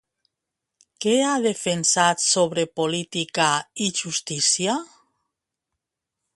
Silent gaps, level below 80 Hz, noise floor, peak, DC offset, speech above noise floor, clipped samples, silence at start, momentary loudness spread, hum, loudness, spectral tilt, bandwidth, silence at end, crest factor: none; -68 dBFS; -84 dBFS; -4 dBFS; under 0.1%; 61 dB; under 0.1%; 1 s; 8 LU; none; -21 LUFS; -2.5 dB/octave; 11.5 kHz; 1.5 s; 20 dB